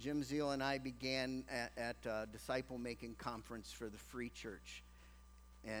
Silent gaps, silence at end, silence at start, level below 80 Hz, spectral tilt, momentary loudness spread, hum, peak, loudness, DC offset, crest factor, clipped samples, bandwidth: none; 0 s; 0 s; -62 dBFS; -4.5 dB/octave; 16 LU; 60 Hz at -60 dBFS; -24 dBFS; -44 LUFS; under 0.1%; 20 dB; under 0.1%; over 20 kHz